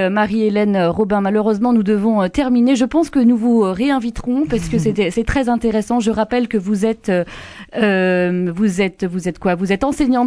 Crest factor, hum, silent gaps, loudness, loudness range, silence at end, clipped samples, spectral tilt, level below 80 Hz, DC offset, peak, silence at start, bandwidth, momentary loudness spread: 12 dB; none; none; -16 LUFS; 3 LU; 0 s; under 0.1%; -6.5 dB/octave; -38 dBFS; under 0.1%; -4 dBFS; 0 s; 11 kHz; 5 LU